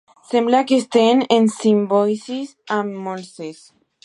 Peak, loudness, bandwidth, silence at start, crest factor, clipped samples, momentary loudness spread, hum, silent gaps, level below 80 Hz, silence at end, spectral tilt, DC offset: -2 dBFS; -18 LUFS; 11 kHz; 0.3 s; 18 dB; under 0.1%; 15 LU; none; none; -74 dBFS; 0.5 s; -5 dB/octave; under 0.1%